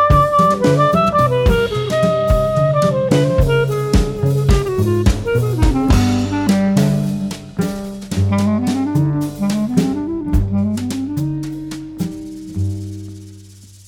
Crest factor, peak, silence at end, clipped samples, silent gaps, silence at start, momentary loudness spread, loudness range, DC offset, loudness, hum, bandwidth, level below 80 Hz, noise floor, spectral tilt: 16 dB; 0 dBFS; 0.2 s; under 0.1%; none; 0 s; 12 LU; 6 LU; under 0.1%; -16 LUFS; none; 17 kHz; -24 dBFS; -40 dBFS; -7 dB/octave